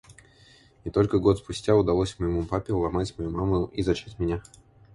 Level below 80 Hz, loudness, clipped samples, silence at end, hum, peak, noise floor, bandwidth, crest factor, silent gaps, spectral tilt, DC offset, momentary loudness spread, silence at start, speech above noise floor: -42 dBFS; -26 LUFS; under 0.1%; 0.55 s; none; -8 dBFS; -56 dBFS; 11.5 kHz; 20 dB; none; -7 dB/octave; under 0.1%; 8 LU; 0.1 s; 31 dB